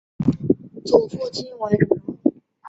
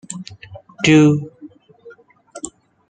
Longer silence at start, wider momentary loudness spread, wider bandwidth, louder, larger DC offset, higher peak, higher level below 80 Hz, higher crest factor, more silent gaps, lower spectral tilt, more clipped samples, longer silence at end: about the same, 0.2 s vs 0.1 s; second, 9 LU vs 23 LU; second, 8.2 kHz vs 9.4 kHz; second, -22 LUFS vs -14 LUFS; neither; about the same, -2 dBFS vs -2 dBFS; first, -52 dBFS vs -58 dBFS; about the same, 20 dB vs 18 dB; neither; first, -7.5 dB/octave vs -5.5 dB/octave; neither; second, 0 s vs 0.4 s